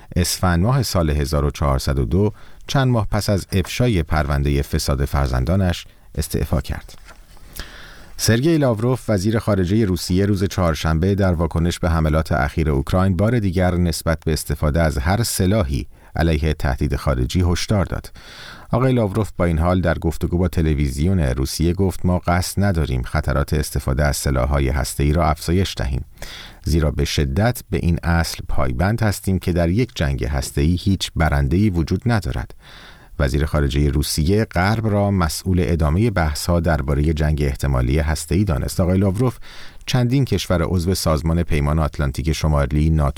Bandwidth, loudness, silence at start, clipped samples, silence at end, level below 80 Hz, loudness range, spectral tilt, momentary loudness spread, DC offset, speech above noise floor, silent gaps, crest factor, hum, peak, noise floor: 18 kHz; -20 LUFS; 0 s; under 0.1%; 0.05 s; -26 dBFS; 2 LU; -6 dB/octave; 6 LU; 0.2%; 22 dB; none; 14 dB; none; -4 dBFS; -41 dBFS